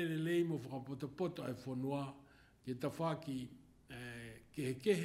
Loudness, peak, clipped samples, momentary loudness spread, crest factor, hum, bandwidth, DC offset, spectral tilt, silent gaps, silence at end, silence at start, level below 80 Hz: -42 LUFS; -22 dBFS; under 0.1%; 15 LU; 20 dB; none; 16 kHz; under 0.1%; -6.5 dB/octave; none; 0 s; 0 s; -72 dBFS